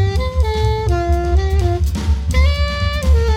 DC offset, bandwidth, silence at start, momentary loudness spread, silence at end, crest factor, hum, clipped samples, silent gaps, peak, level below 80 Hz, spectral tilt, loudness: under 0.1%; 10.5 kHz; 0 s; 3 LU; 0 s; 12 dB; none; under 0.1%; none; -4 dBFS; -16 dBFS; -6.5 dB/octave; -17 LUFS